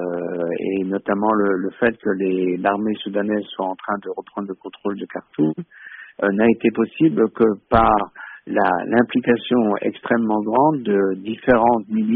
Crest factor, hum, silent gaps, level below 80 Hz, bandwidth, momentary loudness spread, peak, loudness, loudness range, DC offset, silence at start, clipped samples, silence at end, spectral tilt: 16 dB; none; none; -46 dBFS; 4 kHz; 13 LU; -2 dBFS; -20 LUFS; 6 LU; under 0.1%; 0 s; under 0.1%; 0 s; -5 dB/octave